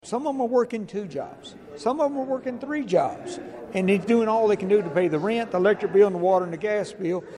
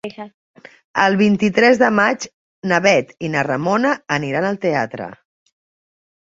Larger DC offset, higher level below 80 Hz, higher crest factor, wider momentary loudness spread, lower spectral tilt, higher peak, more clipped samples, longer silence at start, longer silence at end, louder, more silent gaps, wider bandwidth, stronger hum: neither; second, -66 dBFS vs -60 dBFS; about the same, 16 dB vs 18 dB; second, 14 LU vs 18 LU; about the same, -6.5 dB/octave vs -5.5 dB/octave; second, -8 dBFS vs 0 dBFS; neither; about the same, 0.05 s vs 0.05 s; second, 0 s vs 1.05 s; second, -24 LUFS vs -17 LUFS; second, none vs 0.34-0.54 s, 0.84-0.94 s, 2.34-2.62 s; first, 11 kHz vs 7.8 kHz; neither